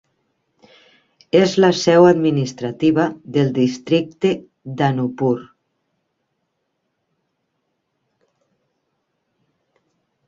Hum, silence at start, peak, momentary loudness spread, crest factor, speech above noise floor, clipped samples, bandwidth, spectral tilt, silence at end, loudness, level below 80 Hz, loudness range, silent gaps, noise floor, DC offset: none; 1.35 s; -2 dBFS; 10 LU; 20 dB; 57 dB; under 0.1%; 7.6 kHz; -6.5 dB/octave; 4.85 s; -17 LUFS; -60 dBFS; 10 LU; none; -73 dBFS; under 0.1%